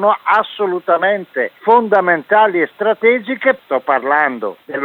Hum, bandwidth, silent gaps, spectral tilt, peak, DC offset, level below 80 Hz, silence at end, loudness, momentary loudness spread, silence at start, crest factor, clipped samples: none; 4.9 kHz; none; -7 dB/octave; 0 dBFS; under 0.1%; -72 dBFS; 0 s; -15 LUFS; 7 LU; 0 s; 14 dB; under 0.1%